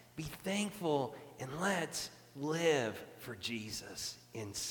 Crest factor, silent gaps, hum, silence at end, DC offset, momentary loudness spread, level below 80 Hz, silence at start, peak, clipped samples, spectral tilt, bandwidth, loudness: 20 dB; none; none; 0 s; under 0.1%; 13 LU; -68 dBFS; 0 s; -18 dBFS; under 0.1%; -3.5 dB/octave; 19 kHz; -38 LUFS